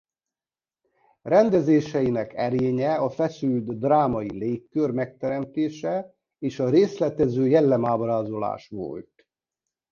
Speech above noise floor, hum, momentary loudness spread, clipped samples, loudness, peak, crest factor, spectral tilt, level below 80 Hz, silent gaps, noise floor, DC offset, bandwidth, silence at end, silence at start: over 67 dB; none; 12 LU; under 0.1%; -24 LUFS; -6 dBFS; 18 dB; -8 dB/octave; -58 dBFS; none; under -90 dBFS; under 0.1%; 7 kHz; 0.9 s; 1.25 s